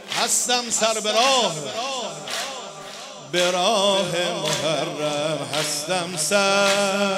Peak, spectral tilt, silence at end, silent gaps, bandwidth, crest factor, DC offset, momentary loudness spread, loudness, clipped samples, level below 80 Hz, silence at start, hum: -4 dBFS; -2 dB/octave; 0 s; none; 16 kHz; 18 dB; under 0.1%; 10 LU; -21 LUFS; under 0.1%; -70 dBFS; 0 s; none